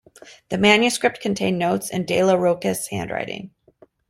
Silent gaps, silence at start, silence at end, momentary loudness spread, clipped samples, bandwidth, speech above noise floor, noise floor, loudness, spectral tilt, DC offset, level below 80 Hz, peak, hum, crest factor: none; 0.25 s; 0.6 s; 12 LU; under 0.1%; 16 kHz; 34 dB; -54 dBFS; -20 LUFS; -4 dB/octave; under 0.1%; -58 dBFS; -2 dBFS; none; 20 dB